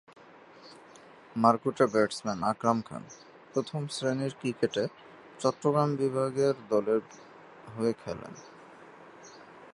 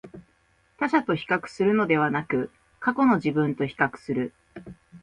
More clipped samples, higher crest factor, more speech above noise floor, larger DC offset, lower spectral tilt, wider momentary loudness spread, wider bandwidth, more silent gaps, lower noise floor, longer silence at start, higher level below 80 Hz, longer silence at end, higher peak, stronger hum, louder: neither; first, 24 dB vs 18 dB; second, 24 dB vs 41 dB; neither; second, -6 dB/octave vs -7.5 dB/octave; first, 25 LU vs 13 LU; first, 11.5 kHz vs 10 kHz; neither; second, -53 dBFS vs -64 dBFS; first, 0.65 s vs 0.05 s; second, -70 dBFS vs -62 dBFS; about the same, 0.05 s vs 0.05 s; about the same, -8 dBFS vs -6 dBFS; neither; second, -29 LUFS vs -25 LUFS